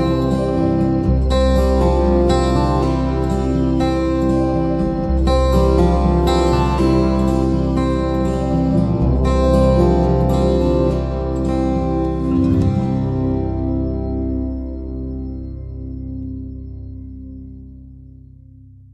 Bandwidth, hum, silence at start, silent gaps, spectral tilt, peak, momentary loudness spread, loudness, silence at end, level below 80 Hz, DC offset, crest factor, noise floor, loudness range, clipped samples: 10 kHz; none; 0 s; none; -8 dB/octave; -2 dBFS; 14 LU; -17 LUFS; 0.85 s; -22 dBFS; under 0.1%; 14 dB; -42 dBFS; 12 LU; under 0.1%